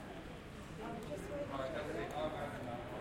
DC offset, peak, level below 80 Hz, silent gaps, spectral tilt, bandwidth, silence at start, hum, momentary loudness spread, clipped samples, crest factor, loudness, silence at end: under 0.1%; -28 dBFS; -58 dBFS; none; -6 dB/octave; 16.5 kHz; 0 s; none; 9 LU; under 0.1%; 16 dB; -44 LUFS; 0 s